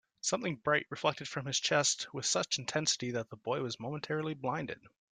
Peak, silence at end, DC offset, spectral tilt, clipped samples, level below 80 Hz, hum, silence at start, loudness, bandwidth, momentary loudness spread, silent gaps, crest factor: -14 dBFS; 0.25 s; under 0.1%; -2.5 dB/octave; under 0.1%; -74 dBFS; none; 0.25 s; -33 LUFS; 11 kHz; 9 LU; none; 22 dB